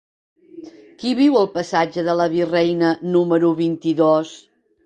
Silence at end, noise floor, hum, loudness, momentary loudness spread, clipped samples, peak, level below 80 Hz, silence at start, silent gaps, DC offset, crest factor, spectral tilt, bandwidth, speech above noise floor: 0.5 s; -40 dBFS; none; -18 LUFS; 5 LU; under 0.1%; -4 dBFS; -64 dBFS; 0.55 s; none; under 0.1%; 16 dB; -6.5 dB/octave; 9.2 kHz; 22 dB